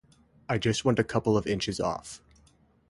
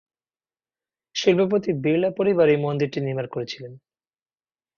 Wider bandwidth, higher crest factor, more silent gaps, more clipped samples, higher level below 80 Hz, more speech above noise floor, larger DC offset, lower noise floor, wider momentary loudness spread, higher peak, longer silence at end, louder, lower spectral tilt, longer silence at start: first, 11.5 kHz vs 7 kHz; about the same, 20 dB vs 18 dB; neither; neither; first, -54 dBFS vs -64 dBFS; second, 35 dB vs over 68 dB; neither; second, -62 dBFS vs under -90 dBFS; first, 19 LU vs 13 LU; second, -10 dBFS vs -6 dBFS; second, 0.75 s vs 1 s; second, -28 LUFS vs -22 LUFS; about the same, -5.5 dB/octave vs -6 dB/octave; second, 0.5 s vs 1.15 s